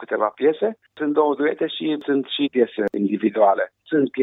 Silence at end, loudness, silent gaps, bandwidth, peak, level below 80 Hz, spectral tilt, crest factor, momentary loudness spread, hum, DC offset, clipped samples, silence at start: 0 s; -21 LUFS; none; 4 kHz; -4 dBFS; -72 dBFS; -8 dB/octave; 16 dB; 6 LU; none; under 0.1%; under 0.1%; 0 s